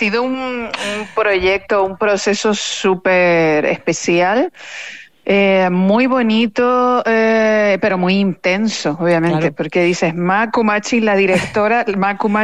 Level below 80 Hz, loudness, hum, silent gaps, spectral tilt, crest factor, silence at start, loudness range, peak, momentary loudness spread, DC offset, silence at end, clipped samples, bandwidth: -50 dBFS; -15 LUFS; none; none; -5 dB/octave; 12 dB; 0 s; 2 LU; -4 dBFS; 7 LU; 0.5%; 0 s; under 0.1%; 10.5 kHz